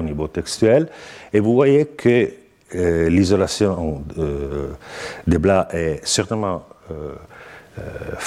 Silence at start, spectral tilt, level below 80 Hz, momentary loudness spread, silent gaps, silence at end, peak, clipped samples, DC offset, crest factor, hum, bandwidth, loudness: 0 s; -5.5 dB/octave; -38 dBFS; 17 LU; none; 0 s; -4 dBFS; under 0.1%; under 0.1%; 16 dB; none; 13.5 kHz; -19 LUFS